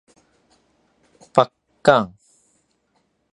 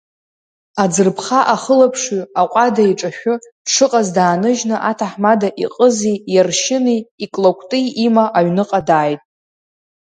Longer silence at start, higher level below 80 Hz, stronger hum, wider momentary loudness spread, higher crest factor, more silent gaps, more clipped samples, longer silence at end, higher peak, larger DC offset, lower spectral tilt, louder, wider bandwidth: first, 1.35 s vs 0.75 s; about the same, -62 dBFS vs -62 dBFS; neither; about the same, 8 LU vs 7 LU; first, 24 dB vs 16 dB; second, none vs 3.52-3.65 s, 7.11-7.18 s; neither; first, 1.3 s vs 0.95 s; about the same, 0 dBFS vs 0 dBFS; neither; about the same, -5.5 dB/octave vs -4.5 dB/octave; second, -19 LUFS vs -15 LUFS; about the same, 10.5 kHz vs 9.6 kHz